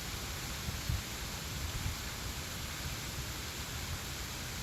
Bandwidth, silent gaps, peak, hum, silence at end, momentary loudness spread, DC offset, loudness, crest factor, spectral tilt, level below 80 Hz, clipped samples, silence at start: 17 kHz; none; -22 dBFS; none; 0 s; 2 LU; under 0.1%; -39 LUFS; 18 dB; -3 dB/octave; -46 dBFS; under 0.1%; 0 s